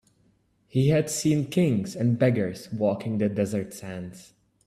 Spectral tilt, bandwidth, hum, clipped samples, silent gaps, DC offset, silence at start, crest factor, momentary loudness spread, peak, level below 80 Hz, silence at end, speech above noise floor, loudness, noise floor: -6.5 dB/octave; 14.5 kHz; none; under 0.1%; none; under 0.1%; 0.75 s; 18 dB; 13 LU; -8 dBFS; -60 dBFS; 0.45 s; 41 dB; -25 LUFS; -65 dBFS